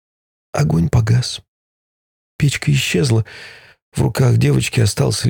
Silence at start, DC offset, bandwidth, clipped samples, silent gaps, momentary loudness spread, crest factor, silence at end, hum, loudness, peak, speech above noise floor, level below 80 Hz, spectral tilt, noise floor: 0.55 s; under 0.1%; 18 kHz; under 0.1%; 1.48-2.39 s, 3.82-3.92 s; 14 LU; 14 dB; 0 s; none; -17 LUFS; -4 dBFS; over 74 dB; -40 dBFS; -5.5 dB/octave; under -90 dBFS